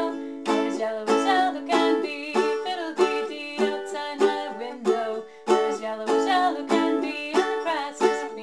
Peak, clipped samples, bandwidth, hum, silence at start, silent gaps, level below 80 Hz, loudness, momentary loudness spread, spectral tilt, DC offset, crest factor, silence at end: -8 dBFS; under 0.1%; 12.5 kHz; none; 0 s; none; -76 dBFS; -25 LUFS; 8 LU; -3.5 dB/octave; 0.2%; 18 dB; 0 s